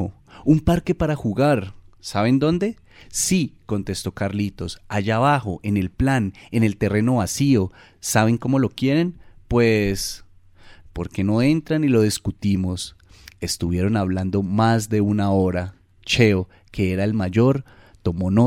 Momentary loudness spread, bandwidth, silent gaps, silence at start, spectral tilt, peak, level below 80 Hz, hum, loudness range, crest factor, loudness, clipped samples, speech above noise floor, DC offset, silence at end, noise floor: 11 LU; 16 kHz; none; 0 s; -6 dB/octave; -4 dBFS; -42 dBFS; none; 2 LU; 18 dB; -21 LUFS; under 0.1%; 27 dB; under 0.1%; 0 s; -47 dBFS